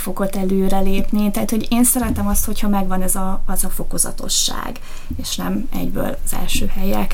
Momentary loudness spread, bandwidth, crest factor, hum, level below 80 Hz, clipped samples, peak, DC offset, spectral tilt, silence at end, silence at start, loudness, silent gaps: 9 LU; 17 kHz; 12 dB; none; -22 dBFS; under 0.1%; -4 dBFS; under 0.1%; -4 dB/octave; 0 s; 0 s; -20 LUFS; none